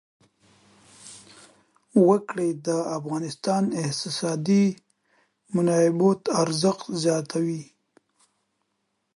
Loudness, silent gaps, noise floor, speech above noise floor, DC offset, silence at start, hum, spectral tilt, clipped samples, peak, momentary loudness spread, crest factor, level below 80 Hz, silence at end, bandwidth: -24 LUFS; none; -76 dBFS; 53 dB; under 0.1%; 1.05 s; none; -5.5 dB/octave; under 0.1%; -6 dBFS; 11 LU; 18 dB; -72 dBFS; 1.55 s; 11.5 kHz